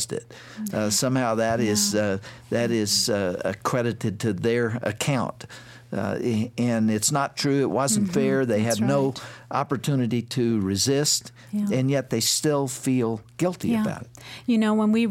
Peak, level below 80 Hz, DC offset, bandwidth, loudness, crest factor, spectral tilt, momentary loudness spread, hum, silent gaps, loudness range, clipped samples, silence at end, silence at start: -10 dBFS; -62 dBFS; under 0.1%; 16.5 kHz; -24 LUFS; 14 dB; -4.5 dB/octave; 9 LU; none; none; 2 LU; under 0.1%; 0 s; 0 s